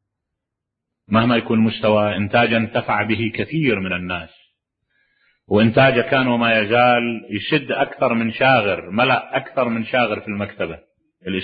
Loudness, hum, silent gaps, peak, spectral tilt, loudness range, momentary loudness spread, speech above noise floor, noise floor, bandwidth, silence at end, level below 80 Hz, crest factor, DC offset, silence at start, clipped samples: -18 LUFS; none; none; -2 dBFS; -10.5 dB/octave; 4 LU; 11 LU; 64 dB; -82 dBFS; 5 kHz; 0 s; -52 dBFS; 18 dB; under 0.1%; 1.1 s; under 0.1%